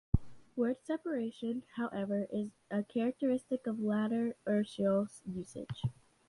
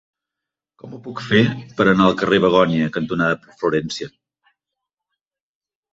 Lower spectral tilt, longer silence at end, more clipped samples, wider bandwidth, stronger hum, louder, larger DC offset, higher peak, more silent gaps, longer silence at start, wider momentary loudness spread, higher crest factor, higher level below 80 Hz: about the same, -7.5 dB/octave vs -6.5 dB/octave; second, 0.35 s vs 1.85 s; neither; first, 11.5 kHz vs 7.8 kHz; neither; second, -36 LUFS vs -18 LUFS; neither; second, -14 dBFS vs 0 dBFS; neither; second, 0.15 s vs 0.85 s; second, 8 LU vs 17 LU; about the same, 22 dB vs 20 dB; about the same, -52 dBFS vs -52 dBFS